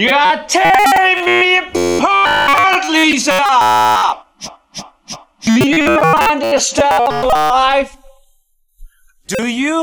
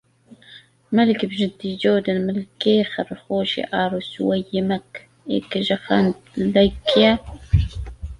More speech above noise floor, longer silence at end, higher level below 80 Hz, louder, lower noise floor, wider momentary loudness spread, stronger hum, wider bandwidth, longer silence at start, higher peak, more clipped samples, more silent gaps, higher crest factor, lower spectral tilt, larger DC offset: first, 44 dB vs 29 dB; about the same, 0 s vs 0.05 s; about the same, -40 dBFS vs -36 dBFS; first, -11 LUFS vs -21 LUFS; first, -56 dBFS vs -49 dBFS; first, 18 LU vs 9 LU; neither; first, over 20 kHz vs 10.5 kHz; second, 0 s vs 0.3 s; about the same, 0 dBFS vs -2 dBFS; neither; neither; about the same, 14 dB vs 18 dB; second, -3 dB/octave vs -7 dB/octave; neither